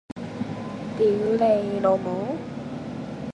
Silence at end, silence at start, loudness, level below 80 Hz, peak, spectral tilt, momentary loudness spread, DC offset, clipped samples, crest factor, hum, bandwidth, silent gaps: 0 s; 0.1 s; -25 LUFS; -56 dBFS; -8 dBFS; -8 dB/octave; 13 LU; under 0.1%; under 0.1%; 16 dB; none; 10.5 kHz; none